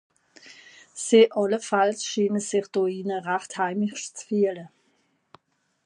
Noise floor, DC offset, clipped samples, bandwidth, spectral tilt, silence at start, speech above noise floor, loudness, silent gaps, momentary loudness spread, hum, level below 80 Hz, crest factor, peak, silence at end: -68 dBFS; under 0.1%; under 0.1%; 11 kHz; -4 dB/octave; 0.45 s; 45 dB; -24 LUFS; none; 12 LU; none; -80 dBFS; 20 dB; -6 dBFS; 1.2 s